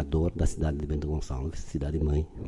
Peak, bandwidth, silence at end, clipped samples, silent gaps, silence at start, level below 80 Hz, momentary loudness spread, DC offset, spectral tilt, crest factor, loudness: -14 dBFS; 11.5 kHz; 0 s; under 0.1%; none; 0 s; -34 dBFS; 7 LU; under 0.1%; -7.5 dB/octave; 16 dB; -31 LUFS